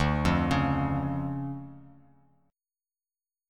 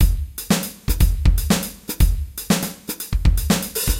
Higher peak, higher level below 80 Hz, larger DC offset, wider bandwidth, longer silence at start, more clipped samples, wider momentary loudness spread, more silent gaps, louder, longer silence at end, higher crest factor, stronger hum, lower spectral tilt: second, -10 dBFS vs -6 dBFS; second, -42 dBFS vs -20 dBFS; neither; second, 12 kHz vs 17 kHz; about the same, 0 s vs 0 s; neither; first, 14 LU vs 9 LU; neither; second, -28 LUFS vs -21 LUFS; first, 1.6 s vs 0 s; first, 20 dB vs 14 dB; neither; first, -7 dB/octave vs -4.5 dB/octave